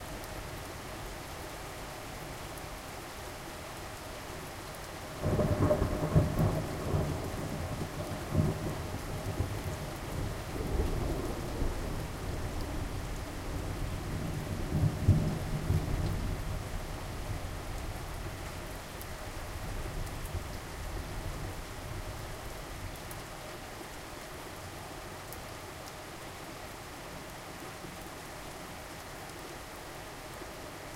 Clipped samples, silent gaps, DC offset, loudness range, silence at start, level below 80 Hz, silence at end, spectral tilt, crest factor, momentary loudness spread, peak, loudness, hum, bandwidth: under 0.1%; none; under 0.1%; 11 LU; 0 s; -42 dBFS; 0 s; -5.5 dB/octave; 22 dB; 13 LU; -14 dBFS; -37 LUFS; none; 16 kHz